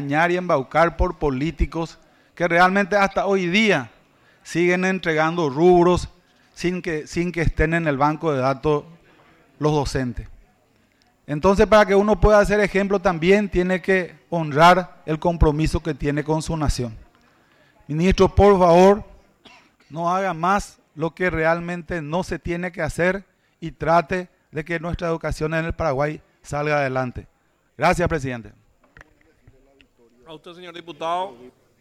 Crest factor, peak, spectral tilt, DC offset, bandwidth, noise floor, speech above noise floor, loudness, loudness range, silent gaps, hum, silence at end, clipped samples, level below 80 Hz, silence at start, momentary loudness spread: 16 dB; -6 dBFS; -6 dB/octave; under 0.1%; 14 kHz; -61 dBFS; 41 dB; -20 LUFS; 7 LU; none; none; 0.3 s; under 0.1%; -34 dBFS; 0 s; 15 LU